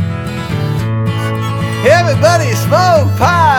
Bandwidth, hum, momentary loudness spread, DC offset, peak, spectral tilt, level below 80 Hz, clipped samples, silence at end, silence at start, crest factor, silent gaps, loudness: 18 kHz; none; 8 LU; under 0.1%; 0 dBFS; -5.5 dB/octave; -38 dBFS; under 0.1%; 0 s; 0 s; 12 dB; none; -12 LUFS